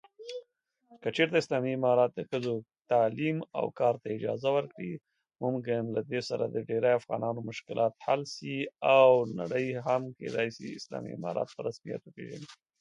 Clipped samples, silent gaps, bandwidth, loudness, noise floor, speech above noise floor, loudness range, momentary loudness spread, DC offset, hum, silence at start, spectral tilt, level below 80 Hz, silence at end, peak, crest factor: under 0.1%; none; 10.5 kHz; -30 LUFS; -68 dBFS; 38 dB; 5 LU; 15 LU; under 0.1%; none; 0.2 s; -6 dB/octave; -76 dBFS; 0.25 s; -10 dBFS; 22 dB